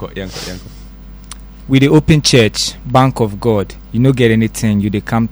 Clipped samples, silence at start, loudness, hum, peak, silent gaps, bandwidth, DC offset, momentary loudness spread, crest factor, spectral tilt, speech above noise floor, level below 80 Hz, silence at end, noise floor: under 0.1%; 0 s; -13 LUFS; none; 0 dBFS; none; over 20 kHz; under 0.1%; 19 LU; 14 dB; -5.5 dB/octave; 20 dB; -32 dBFS; 0 s; -33 dBFS